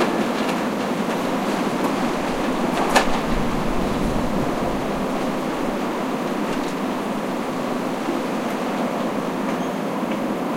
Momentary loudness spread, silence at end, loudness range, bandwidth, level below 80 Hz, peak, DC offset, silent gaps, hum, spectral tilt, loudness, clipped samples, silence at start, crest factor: 3 LU; 0 s; 3 LU; 16 kHz; -38 dBFS; -2 dBFS; under 0.1%; none; none; -5 dB/octave; -23 LUFS; under 0.1%; 0 s; 20 dB